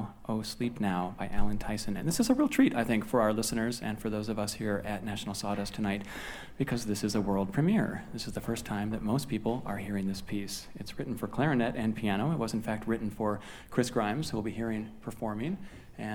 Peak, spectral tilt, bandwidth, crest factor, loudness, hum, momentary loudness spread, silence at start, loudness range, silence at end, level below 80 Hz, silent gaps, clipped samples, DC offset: -12 dBFS; -5.5 dB/octave; 20 kHz; 20 dB; -32 LUFS; none; 10 LU; 0 s; 5 LU; 0 s; -48 dBFS; none; under 0.1%; under 0.1%